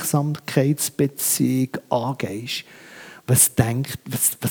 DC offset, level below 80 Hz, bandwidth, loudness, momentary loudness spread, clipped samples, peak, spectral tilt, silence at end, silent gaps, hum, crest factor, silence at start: under 0.1%; -56 dBFS; over 20 kHz; -21 LUFS; 13 LU; under 0.1%; -2 dBFS; -4.5 dB/octave; 0 s; none; none; 20 dB; 0 s